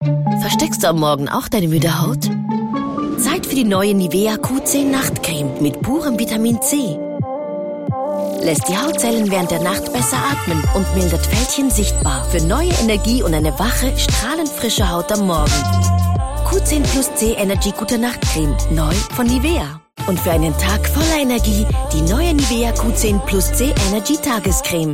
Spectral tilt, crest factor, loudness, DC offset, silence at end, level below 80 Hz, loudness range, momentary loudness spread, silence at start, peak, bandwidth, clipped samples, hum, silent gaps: -4.5 dB/octave; 12 dB; -17 LUFS; 0.1%; 0 s; -24 dBFS; 2 LU; 4 LU; 0 s; -4 dBFS; 16.5 kHz; under 0.1%; none; none